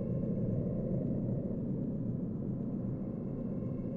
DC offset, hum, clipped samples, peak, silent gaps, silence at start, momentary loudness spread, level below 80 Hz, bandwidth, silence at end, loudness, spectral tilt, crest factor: under 0.1%; none; under 0.1%; -22 dBFS; none; 0 s; 4 LU; -52 dBFS; 2.9 kHz; 0 s; -36 LUFS; -13.5 dB/octave; 12 dB